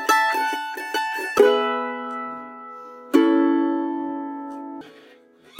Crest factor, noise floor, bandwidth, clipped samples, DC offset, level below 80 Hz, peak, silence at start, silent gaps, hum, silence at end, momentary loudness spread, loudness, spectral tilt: 20 dB; -51 dBFS; 16.5 kHz; under 0.1%; under 0.1%; -70 dBFS; -2 dBFS; 0 s; none; none; 0 s; 20 LU; -22 LUFS; -2.5 dB/octave